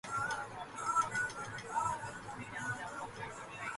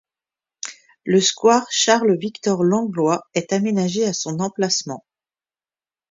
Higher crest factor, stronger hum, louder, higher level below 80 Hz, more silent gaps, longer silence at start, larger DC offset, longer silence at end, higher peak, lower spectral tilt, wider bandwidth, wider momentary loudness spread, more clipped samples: about the same, 18 dB vs 20 dB; neither; second, -39 LUFS vs -19 LUFS; about the same, -66 dBFS vs -68 dBFS; neither; second, 0.05 s vs 0.65 s; neither; second, 0 s vs 1.1 s; second, -22 dBFS vs 0 dBFS; about the same, -3 dB/octave vs -4 dB/octave; first, 11.5 kHz vs 7.8 kHz; second, 11 LU vs 17 LU; neither